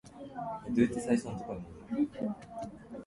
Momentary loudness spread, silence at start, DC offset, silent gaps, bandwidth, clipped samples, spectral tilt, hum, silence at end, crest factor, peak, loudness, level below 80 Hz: 14 LU; 0.05 s; under 0.1%; none; 11.5 kHz; under 0.1%; -6.5 dB/octave; none; 0 s; 20 dB; -14 dBFS; -35 LUFS; -60 dBFS